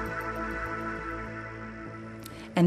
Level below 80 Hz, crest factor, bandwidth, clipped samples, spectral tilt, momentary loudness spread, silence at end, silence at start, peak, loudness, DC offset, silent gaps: -48 dBFS; 20 dB; 14 kHz; under 0.1%; -7 dB/octave; 8 LU; 0 s; 0 s; -12 dBFS; -36 LUFS; under 0.1%; none